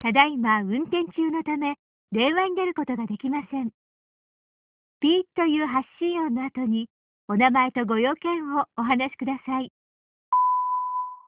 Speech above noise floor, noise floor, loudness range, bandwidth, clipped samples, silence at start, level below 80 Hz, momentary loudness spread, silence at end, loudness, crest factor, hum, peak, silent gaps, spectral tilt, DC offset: over 66 dB; under -90 dBFS; 3 LU; 4 kHz; under 0.1%; 0 s; -66 dBFS; 10 LU; 0.1 s; -25 LUFS; 22 dB; none; -4 dBFS; 1.79-2.08 s, 3.74-5.01 s, 6.90-7.28 s, 9.70-10.32 s; -2.5 dB/octave; under 0.1%